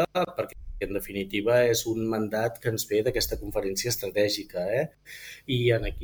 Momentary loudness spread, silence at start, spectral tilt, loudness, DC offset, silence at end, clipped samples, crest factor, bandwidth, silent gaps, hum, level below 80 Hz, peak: 11 LU; 0 s; -4.5 dB/octave; -27 LUFS; under 0.1%; 0 s; under 0.1%; 18 dB; over 20 kHz; none; none; -44 dBFS; -10 dBFS